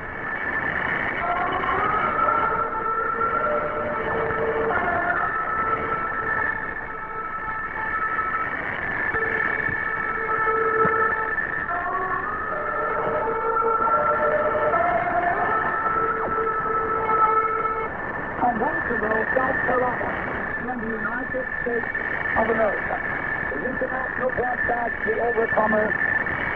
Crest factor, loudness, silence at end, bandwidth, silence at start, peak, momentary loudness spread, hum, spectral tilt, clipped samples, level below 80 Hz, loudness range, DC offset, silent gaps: 16 dB; -23 LUFS; 0 s; 6 kHz; 0 s; -8 dBFS; 6 LU; none; -8 dB/octave; under 0.1%; -46 dBFS; 3 LU; under 0.1%; none